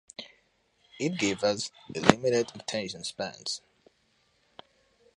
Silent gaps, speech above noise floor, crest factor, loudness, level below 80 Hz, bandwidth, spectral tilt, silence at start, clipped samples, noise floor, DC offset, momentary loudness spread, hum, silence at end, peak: none; 41 dB; 32 dB; -29 LUFS; -62 dBFS; 11.5 kHz; -4 dB/octave; 0.2 s; under 0.1%; -70 dBFS; under 0.1%; 14 LU; none; 1.6 s; 0 dBFS